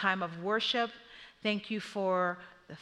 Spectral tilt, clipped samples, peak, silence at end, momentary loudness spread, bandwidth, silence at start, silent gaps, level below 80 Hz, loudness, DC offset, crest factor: -5 dB/octave; under 0.1%; -14 dBFS; 0 s; 18 LU; 11.5 kHz; 0 s; none; -74 dBFS; -33 LUFS; under 0.1%; 20 dB